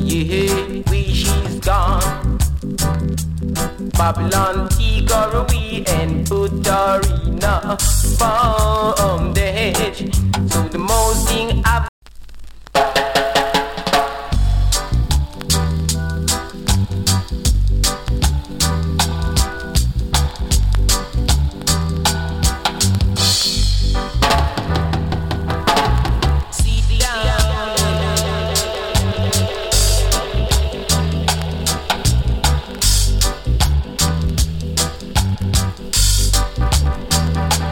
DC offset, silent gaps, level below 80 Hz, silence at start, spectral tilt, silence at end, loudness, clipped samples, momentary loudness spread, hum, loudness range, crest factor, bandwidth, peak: under 0.1%; 11.89-12.02 s; -20 dBFS; 0 s; -4 dB/octave; 0 s; -17 LUFS; under 0.1%; 4 LU; none; 2 LU; 16 dB; 17.5 kHz; -2 dBFS